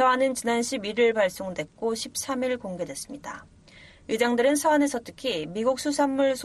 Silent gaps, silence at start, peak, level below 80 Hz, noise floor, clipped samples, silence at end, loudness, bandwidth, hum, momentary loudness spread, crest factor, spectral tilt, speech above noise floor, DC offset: none; 0 s; -10 dBFS; -60 dBFS; -51 dBFS; under 0.1%; 0 s; -26 LUFS; 13 kHz; none; 13 LU; 16 dB; -3.5 dB/octave; 26 dB; under 0.1%